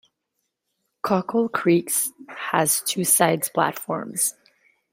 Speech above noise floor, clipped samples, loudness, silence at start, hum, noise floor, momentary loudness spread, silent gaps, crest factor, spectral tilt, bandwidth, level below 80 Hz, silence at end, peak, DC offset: 56 dB; under 0.1%; -22 LUFS; 1.05 s; none; -78 dBFS; 10 LU; none; 20 dB; -3.5 dB/octave; 16 kHz; -70 dBFS; 0.6 s; -4 dBFS; under 0.1%